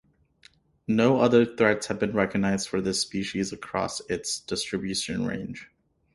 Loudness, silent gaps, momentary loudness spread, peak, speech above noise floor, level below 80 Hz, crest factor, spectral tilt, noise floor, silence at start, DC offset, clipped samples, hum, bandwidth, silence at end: -26 LUFS; none; 10 LU; -6 dBFS; 34 dB; -56 dBFS; 22 dB; -4.5 dB/octave; -59 dBFS; 0.9 s; under 0.1%; under 0.1%; none; 11.5 kHz; 0.5 s